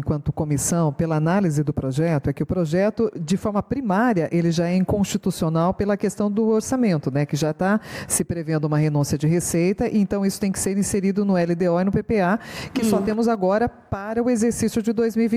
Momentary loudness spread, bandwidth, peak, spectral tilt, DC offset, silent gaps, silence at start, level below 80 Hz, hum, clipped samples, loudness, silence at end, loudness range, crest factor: 4 LU; 16 kHz; -8 dBFS; -6 dB/octave; under 0.1%; none; 0 s; -46 dBFS; none; under 0.1%; -22 LUFS; 0 s; 1 LU; 12 dB